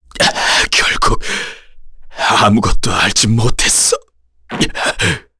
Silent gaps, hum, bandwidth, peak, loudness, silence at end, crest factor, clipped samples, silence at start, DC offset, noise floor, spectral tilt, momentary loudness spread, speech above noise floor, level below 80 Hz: none; none; 11 kHz; 0 dBFS; -13 LUFS; 0.2 s; 14 dB; under 0.1%; 0.15 s; under 0.1%; -33 dBFS; -2.5 dB/octave; 9 LU; 20 dB; -26 dBFS